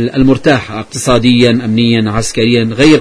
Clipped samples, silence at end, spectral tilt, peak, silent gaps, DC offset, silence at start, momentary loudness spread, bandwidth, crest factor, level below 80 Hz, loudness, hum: 0.5%; 0 s; -5.5 dB/octave; 0 dBFS; none; under 0.1%; 0 s; 6 LU; 11 kHz; 10 dB; -32 dBFS; -10 LUFS; none